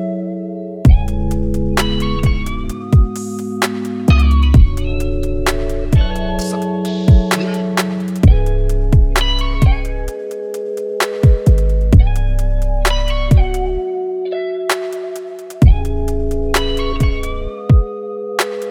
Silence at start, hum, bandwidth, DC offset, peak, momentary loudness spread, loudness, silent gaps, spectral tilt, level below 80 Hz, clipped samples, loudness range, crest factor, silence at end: 0 s; none; 16 kHz; under 0.1%; 0 dBFS; 11 LU; -17 LUFS; none; -6 dB/octave; -16 dBFS; under 0.1%; 3 LU; 14 dB; 0 s